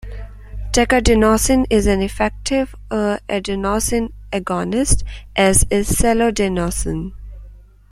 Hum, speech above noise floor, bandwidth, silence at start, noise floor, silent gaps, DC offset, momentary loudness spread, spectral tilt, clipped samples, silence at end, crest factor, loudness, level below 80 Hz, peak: none; 24 dB; 16 kHz; 0.05 s; -40 dBFS; none; under 0.1%; 11 LU; -4 dB/octave; under 0.1%; 0.3 s; 18 dB; -17 LUFS; -26 dBFS; 0 dBFS